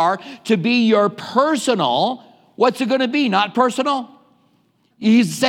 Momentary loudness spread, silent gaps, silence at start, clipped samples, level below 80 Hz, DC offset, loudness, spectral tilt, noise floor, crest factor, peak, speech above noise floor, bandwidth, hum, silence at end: 7 LU; none; 0 s; under 0.1%; -76 dBFS; under 0.1%; -18 LUFS; -4.5 dB/octave; -61 dBFS; 16 dB; -2 dBFS; 44 dB; 16 kHz; none; 0 s